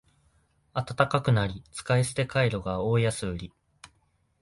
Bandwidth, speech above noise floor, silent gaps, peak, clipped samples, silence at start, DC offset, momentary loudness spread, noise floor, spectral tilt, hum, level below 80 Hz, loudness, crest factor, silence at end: 11.5 kHz; 43 dB; none; -6 dBFS; under 0.1%; 0.75 s; under 0.1%; 11 LU; -69 dBFS; -5.5 dB/octave; none; -50 dBFS; -27 LUFS; 22 dB; 0.55 s